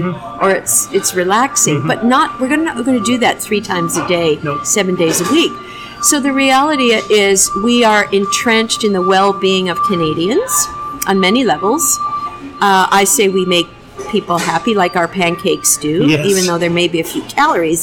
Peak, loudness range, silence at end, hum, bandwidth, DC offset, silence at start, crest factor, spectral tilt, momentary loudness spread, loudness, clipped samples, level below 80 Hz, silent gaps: -2 dBFS; 3 LU; 0 s; none; 18 kHz; under 0.1%; 0 s; 12 dB; -3 dB/octave; 6 LU; -13 LUFS; under 0.1%; -46 dBFS; none